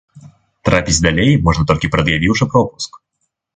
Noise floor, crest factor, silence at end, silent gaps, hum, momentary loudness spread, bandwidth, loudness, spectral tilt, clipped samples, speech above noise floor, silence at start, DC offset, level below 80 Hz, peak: -71 dBFS; 16 dB; 0.6 s; none; none; 9 LU; 9.6 kHz; -14 LUFS; -5 dB/octave; under 0.1%; 57 dB; 0.15 s; under 0.1%; -30 dBFS; 0 dBFS